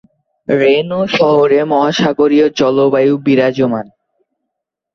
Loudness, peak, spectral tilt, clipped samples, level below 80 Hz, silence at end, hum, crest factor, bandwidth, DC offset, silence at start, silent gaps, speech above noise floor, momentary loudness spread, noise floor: -12 LUFS; 0 dBFS; -6 dB/octave; under 0.1%; -54 dBFS; 1.1 s; none; 12 dB; 6.8 kHz; under 0.1%; 0.5 s; none; 65 dB; 6 LU; -77 dBFS